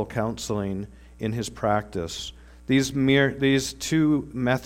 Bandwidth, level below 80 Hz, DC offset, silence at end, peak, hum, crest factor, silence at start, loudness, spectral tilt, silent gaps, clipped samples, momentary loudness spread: 16 kHz; -48 dBFS; under 0.1%; 0 s; -6 dBFS; none; 18 dB; 0 s; -25 LUFS; -5 dB/octave; none; under 0.1%; 14 LU